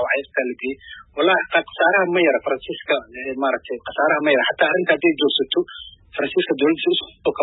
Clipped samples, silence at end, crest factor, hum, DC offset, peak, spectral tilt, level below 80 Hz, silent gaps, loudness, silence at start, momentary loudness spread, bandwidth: under 0.1%; 0 s; 18 dB; none; under 0.1%; -2 dBFS; -9 dB/octave; -58 dBFS; none; -20 LUFS; 0 s; 12 LU; 4.1 kHz